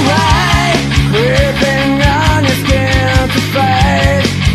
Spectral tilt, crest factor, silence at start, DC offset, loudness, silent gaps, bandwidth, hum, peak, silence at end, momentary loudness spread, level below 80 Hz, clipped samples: -5 dB/octave; 10 dB; 0 s; under 0.1%; -11 LUFS; none; 14 kHz; none; 0 dBFS; 0 s; 2 LU; -20 dBFS; under 0.1%